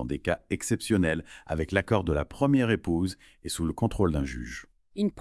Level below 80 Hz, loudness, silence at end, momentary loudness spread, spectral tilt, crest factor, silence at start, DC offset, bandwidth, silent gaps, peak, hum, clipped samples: -44 dBFS; -28 LUFS; 0 s; 11 LU; -6 dB/octave; 22 dB; 0 s; under 0.1%; 12 kHz; none; -6 dBFS; none; under 0.1%